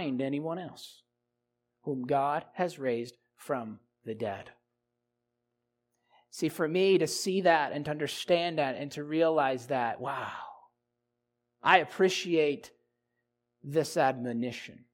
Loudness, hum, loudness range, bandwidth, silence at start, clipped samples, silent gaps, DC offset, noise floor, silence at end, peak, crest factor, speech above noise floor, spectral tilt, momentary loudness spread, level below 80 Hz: -30 LUFS; none; 9 LU; 16.5 kHz; 0 s; under 0.1%; none; under 0.1%; -83 dBFS; 0.15 s; -6 dBFS; 26 dB; 53 dB; -4.5 dB/octave; 18 LU; -78 dBFS